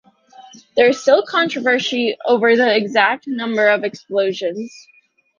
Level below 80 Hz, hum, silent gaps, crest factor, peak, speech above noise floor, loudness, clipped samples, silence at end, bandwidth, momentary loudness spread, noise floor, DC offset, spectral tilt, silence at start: -66 dBFS; none; none; 16 dB; -2 dBFS; 28 dB; -16 LUFS; under 0.1%; 0.7 s; 7.4 kHz; 10 LU; -45 dBFS; under 0.1%; -4 dB/octave; 0.4 s